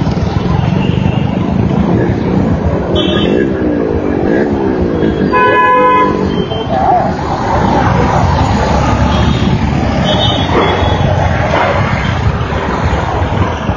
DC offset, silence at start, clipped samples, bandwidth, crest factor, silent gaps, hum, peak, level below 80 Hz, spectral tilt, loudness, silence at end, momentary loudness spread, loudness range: under 0.1%; 0 s; under 0.1%; 7.2 kHz; 10 dB; none; none; 0 dBFS; -22 dBFS; -7 dB/octave; -12 LUFS; 0 s; 5 LU; 2 LU